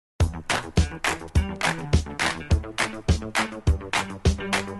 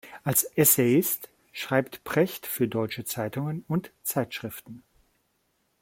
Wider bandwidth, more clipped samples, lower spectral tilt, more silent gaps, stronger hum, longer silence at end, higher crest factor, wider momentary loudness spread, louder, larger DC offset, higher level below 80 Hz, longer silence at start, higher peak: second, 12.5 kHz vs 16.5 kHz; neither; about the same, -4.5 dB/octave vs -4.5 dB/octave; neither; neither; second, 0 s vs 1.05 s; about the same, 18 dB vs 22 dB; second, 3 LU vs 15 LU; about the same, -25 LUFS vs -26 LUFS; neither; first, -30 dBFS vs -64 dBFS; first, 0.2 s vs 0.05 s; about the same, -6 dBFS vs -6 dBFS